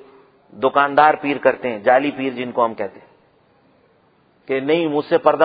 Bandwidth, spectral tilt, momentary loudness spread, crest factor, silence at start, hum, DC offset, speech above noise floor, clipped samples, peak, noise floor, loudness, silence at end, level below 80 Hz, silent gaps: 5 kHz; -8.5 dB/octave; 10 LU; 20 dB; 0.55 s; none; under 0.1%; 40 dB; under 0.1%; 0 dBFS; -57 dBFS; -18 LUFS; 0 s; -66 dBFS; none